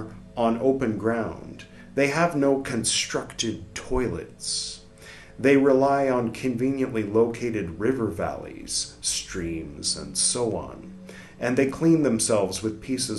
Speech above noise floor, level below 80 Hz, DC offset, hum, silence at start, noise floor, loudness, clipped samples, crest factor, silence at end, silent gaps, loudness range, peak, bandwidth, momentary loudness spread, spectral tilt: 21 dB; -48 dBFS; under 0.1%; none; 0 s; -46 dBFS; -25 LUFS; under 0.1%; 20 dB; 0 s; none; 3 LU; -6 dBFS; 12.5 kHz; 16 LU; -4 dB/octave